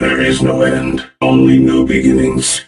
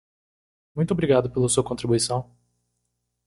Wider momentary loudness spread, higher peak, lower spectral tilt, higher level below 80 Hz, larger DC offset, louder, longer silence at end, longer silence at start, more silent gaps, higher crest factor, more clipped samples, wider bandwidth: about the same, 7 LU vs 8 LU; first, 0 dBFS vs -6 dBFS; about the same, -5 dB/octave vs -5 dB/octave; first, -32 dBFS vs -52 dBFS; neither; first, -11 LUFS vs -23 LUFS; second, 0.05 s vs 1.05 s; second, 0 s vs 0.75 s; neither; second, 12 dB vs 20 dB; neither; about the same, 12 kHz vs 11.5 kHz